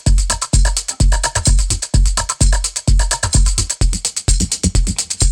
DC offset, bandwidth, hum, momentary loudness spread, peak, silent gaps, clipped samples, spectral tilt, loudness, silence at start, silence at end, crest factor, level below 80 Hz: under 0.1%; 13 kHz; none; 3 LU; 0 dBFS; none; under 0.1%; -3 dB/octave; -16 LUFS; 0.05 s; 0 s; 14 dB; -16 dBFS